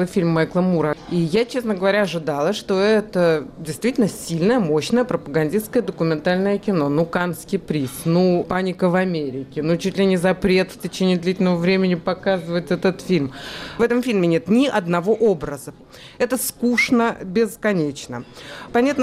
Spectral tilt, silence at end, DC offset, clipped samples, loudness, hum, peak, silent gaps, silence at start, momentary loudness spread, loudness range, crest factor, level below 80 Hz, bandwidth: -6 dB/octave; 0 s; under 0.1%; under 0.1%; -20 LUFS; none; -8 dBFS; none; 0 s; 8 LU; 1 LU; 12 dB; -50 dBFS; 15.5 kHz